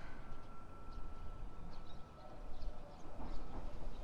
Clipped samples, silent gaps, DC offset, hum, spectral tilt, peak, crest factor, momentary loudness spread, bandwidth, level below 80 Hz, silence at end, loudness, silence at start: under 0.1%; none; under 0.1%; none; -6.5 dB/octave; -28 dBFS; 14 dB; 5 LU; 6.2 kHz; -48 dBFS; 0 s; -54 LUFS; 0 s